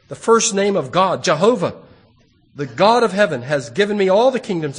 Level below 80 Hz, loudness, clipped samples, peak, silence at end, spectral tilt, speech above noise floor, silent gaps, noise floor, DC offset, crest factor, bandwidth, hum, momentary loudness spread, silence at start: -60 dBFS; -16 LUFS; under 0.1%; 0 dBFS; 0 s; -4 dB/octave; 38 dB; none; -54 dBFS; under 0.1%; 16 dB; 10 kHz; none; 8 LU; 0.1 s